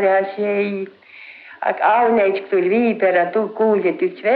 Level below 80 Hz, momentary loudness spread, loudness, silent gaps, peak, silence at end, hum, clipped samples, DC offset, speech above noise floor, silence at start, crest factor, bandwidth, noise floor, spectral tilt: -68 dBFS; 14 LU; -18 LUFS; none; -4 dBFS; 0 s; none; under 0.1%; under 0.1%; 23 dB; 0 s; 14 dB; 4.9 kHz; -40 dBFS; -9.5 dB/octave